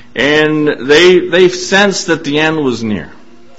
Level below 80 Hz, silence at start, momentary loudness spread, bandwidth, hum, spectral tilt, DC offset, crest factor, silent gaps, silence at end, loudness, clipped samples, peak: -46 dBFS; 0.15 s; 9 LU; 8.2 kHz; none; -4 dB/octave; 2%; 12 dB; none; 0.5 s; -10 LUFS; 0.1%; 0 dBFS